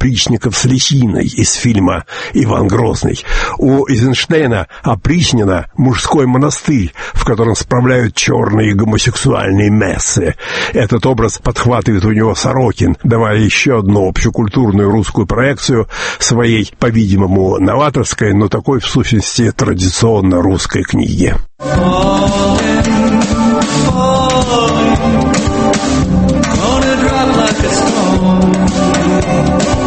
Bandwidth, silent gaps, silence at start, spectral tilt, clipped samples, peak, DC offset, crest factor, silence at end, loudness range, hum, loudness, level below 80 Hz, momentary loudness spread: 8.8 kHz; none; 0 s; -5 dB/octave; under 0.1%; 0 dBFS; under 0.1%; 10 dB; 0 s; 1 LU; none; -12 LUFS; -26 dBFS; 4 LU